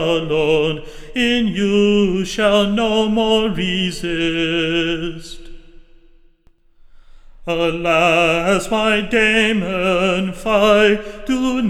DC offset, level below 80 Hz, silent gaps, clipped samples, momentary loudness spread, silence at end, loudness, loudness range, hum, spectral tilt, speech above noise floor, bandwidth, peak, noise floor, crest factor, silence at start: under 0.1%; -38 dBFS; none; under 0.1%; 9 LU; 0 s; -16 LUFS; 8 LU; none; -5 dB/octave; 36 dB; 14 kHz; -2 dBFS; -52 dBFS; 16 dB; 0 s